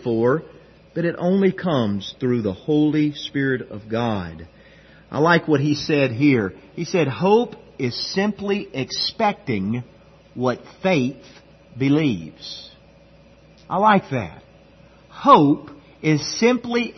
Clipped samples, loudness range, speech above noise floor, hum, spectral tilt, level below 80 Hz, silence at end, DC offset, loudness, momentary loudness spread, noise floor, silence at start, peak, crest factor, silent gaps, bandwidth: under 0.1%; 5 LU; 30 dB; none; -6 dB/octave; -56 dBFS; 0.05 s; under 0.1%; -21 LUFS; 12 LU; -50 dBFS; 0 s; 0 dBFS; 22 dB; none; 6.4 kHz